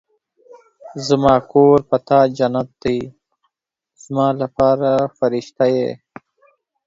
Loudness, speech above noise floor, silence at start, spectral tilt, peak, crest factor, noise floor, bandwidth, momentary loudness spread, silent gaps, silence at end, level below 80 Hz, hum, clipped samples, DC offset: -17 LUFS; 65 dB; 0.85 s; -7 dB/octave; 0 dBFS; 18 dB; -81 dBFS; 7.8 kHz; 13 LU; none; 0.9 s; -50 dBFS; none; under 0.1%; under 0.1%